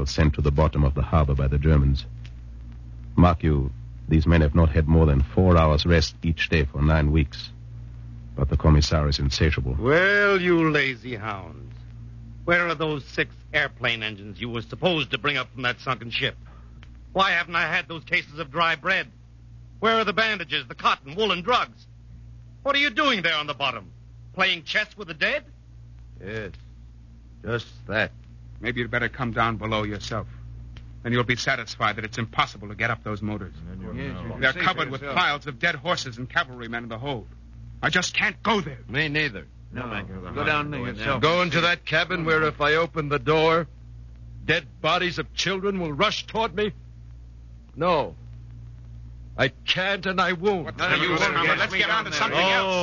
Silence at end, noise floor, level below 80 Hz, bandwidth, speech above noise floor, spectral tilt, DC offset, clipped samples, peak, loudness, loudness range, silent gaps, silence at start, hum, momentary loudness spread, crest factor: 0 s; -46 dBFS; -34 dBFS; 7.4 kHz; 23 dB; -5.5 dB/octave; under 0.1%; under 0.1%; -6 dBFS; -23 LUFS; 7 LU; none; 0 s; none; 18 LU; 20 dB